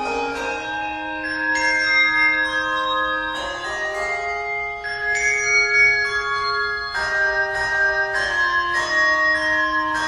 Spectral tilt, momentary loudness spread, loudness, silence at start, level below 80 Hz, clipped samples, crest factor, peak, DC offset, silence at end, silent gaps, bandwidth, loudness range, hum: -1.5 dB/octave; 10 LU; -19 LUFS; 0 s; -48 dBFS; under 0.1%; 14 dB; -6 dBFS; under 0.1%; 0 s; none; 12 kHz; 3 LU; none